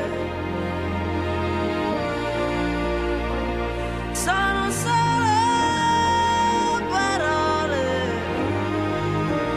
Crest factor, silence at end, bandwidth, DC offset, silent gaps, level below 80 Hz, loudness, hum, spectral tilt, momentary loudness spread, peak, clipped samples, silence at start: 14 dB; 0 s; 14.5 kHz; under 0.1%; none; -36 dBFS; -23 LUFS; none; -4.5 dB/octave; 7 LU; -8 dBFS; under 0.1%; 0 s